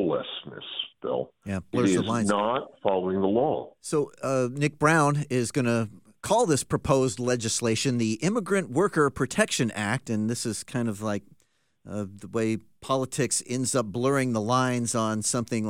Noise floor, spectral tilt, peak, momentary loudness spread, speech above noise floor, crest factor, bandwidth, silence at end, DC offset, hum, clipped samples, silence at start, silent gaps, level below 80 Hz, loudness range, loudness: -69 dBFS; -4.5 dB/octave; -6 dBFS; 9 LU; 43 dB; 20 dB; 16.5 kHz; 0 s; 0.1%; none; under 0.1%; 0 s; none; -58 dBFS; 5 LU; -26 LUFS